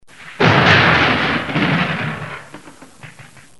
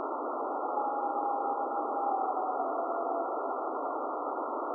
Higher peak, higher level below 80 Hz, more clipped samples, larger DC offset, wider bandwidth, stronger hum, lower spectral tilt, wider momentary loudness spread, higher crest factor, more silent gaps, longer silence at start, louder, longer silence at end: first, 0 dBFS vs -20 dBFS; first, -44 dBFS vs under -90 dBFS; neither; first, 0.5% vs under 0.1%; first, 11.5 kHz vs 1.5 kHz; neither; second, -5.5 dB/octave vs -8.5 dB/octave; first, 17 LU vs 3 LU; about the same, 18 dB vs 14 dB; neither; first, 0.2 s vs 0 s; first, -14 LUFS vs -33 LUFS; first, 0.35 s vs 0 s